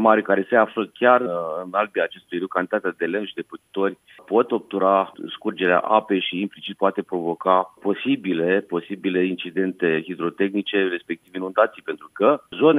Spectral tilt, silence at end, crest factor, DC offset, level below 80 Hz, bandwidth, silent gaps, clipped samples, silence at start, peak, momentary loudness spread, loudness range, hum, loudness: -7.5 dB/octave; 0 s; 20 dB; under 0.1%; -76 dBFS; 10.5 kHz; none; under 0.1%; 0 s; 0 dBFS; 10 LU; 2 LU; none; -22 LUFS